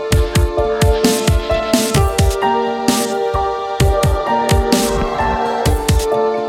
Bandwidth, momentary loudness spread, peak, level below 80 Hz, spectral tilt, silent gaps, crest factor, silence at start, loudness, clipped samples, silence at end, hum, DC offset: 17 kHz; 3 LU; -2 dBFS; -22 dBFS; -5 dB/octave; none; 14 dB; 0 s; -15 LUFS; under 0.1%; 0 s; none; under 0.1%